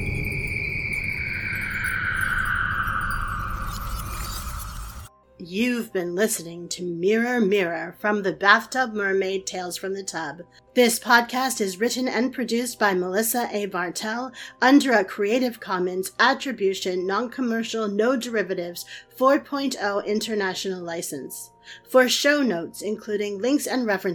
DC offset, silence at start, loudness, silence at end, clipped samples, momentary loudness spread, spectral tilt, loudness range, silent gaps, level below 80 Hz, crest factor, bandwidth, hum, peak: under 0.1%; 0 s; -24 LUFS; 0 s; under 0.1%; 13 LU; -3.5 dB/octave; 5 LU; none; -42 dBFS; 24 dB; 19 kHz; none; 0 dBFS